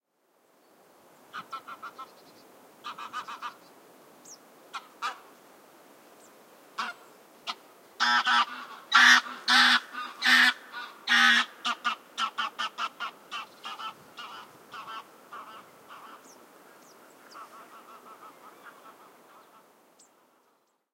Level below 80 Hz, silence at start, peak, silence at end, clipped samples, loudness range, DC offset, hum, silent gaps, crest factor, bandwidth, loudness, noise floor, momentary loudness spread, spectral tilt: under -90 dBFS; 1.35 s; -4 dBFS; 2.05 s; under 0.1%; 22 LU; under 0.1%; none; none; 26 dB; 16 kHz; -24 LUFS; -70 dBFS; 27 LU; 1 dB/octave